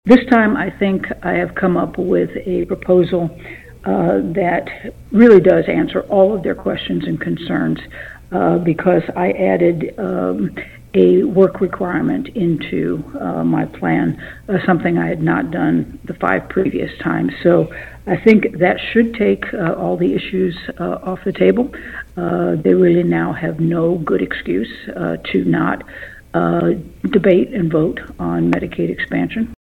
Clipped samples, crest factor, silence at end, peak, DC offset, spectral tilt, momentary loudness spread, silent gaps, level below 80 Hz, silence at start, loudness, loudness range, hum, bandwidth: under 0.1%; 16 dB; 0.05 s; 0 dBFS; under 0.1%; -8.5 dB/octave; 11 LU; none; -42 dBFS; 0.05 s; -16 LUFS; 4 LU; none; 6.2 kHz